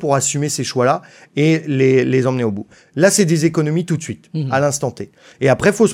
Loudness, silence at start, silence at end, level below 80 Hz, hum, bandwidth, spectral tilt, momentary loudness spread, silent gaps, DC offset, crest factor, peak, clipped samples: -17 LUFS; 0 s; 0 s; -56 dBFS; none; 16 kHz; -5 dB/octave; 12 LU; none; under 0.1%; 16 dB; -2 dBFS; under 0.1%